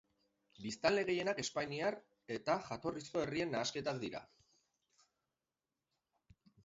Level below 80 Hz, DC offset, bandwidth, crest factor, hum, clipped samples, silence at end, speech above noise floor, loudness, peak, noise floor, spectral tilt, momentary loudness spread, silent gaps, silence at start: -74 dBFS; under 0.1%; 7.6 kHz; 24 dB; none; under 0.1%; 2.4 s; over 51 dB; -39 LUFS; -18 dBFS; under -90 dBFS; -3.5 dB/octave; 12 LU; none; 0.6 s